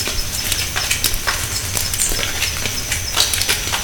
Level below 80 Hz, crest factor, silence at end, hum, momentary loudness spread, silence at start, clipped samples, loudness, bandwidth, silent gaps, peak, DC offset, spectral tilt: -30 dBFS; 20 dB; 0 s; none; 5 LU; 0 s; under 0.1%; -18 LUFS; 19.5 kHz; none; 0 dBFS; under 0.1%; -1 dB/octave